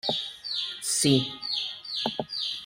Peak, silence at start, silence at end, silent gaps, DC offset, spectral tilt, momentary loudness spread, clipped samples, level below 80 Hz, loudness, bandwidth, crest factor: -10 dBFS; 0.05 s; 0 s; none; under 0.1%; -3 dB/octave; 8 LU; under 0.1%; -66 dBFS; -27 LUFS; 16 kHz; 20 dB